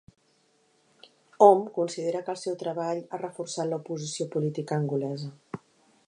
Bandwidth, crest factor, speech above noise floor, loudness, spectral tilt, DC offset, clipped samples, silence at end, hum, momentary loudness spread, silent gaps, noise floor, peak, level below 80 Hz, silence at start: 11 kHz; 24 dB; 40 dB; -27 LUFS; -6 dB/octave; under 0.1%; under 0.1%; 0.5 s; none; 18 LU; none; -67 dBFS; -4 dBFS; -78 dBFS; 1.4 s